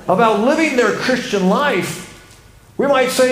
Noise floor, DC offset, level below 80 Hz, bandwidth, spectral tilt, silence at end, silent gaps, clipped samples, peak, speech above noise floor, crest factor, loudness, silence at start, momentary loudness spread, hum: -44 dBFS; under 0.1%; -52 dBFS; 16 kHz; -4.5 dB/octave; 0 s; none; under 0.1%; -2 dBFS; 29 dB; 14 dB; -16 LUFS; 0 s; 14 LU; none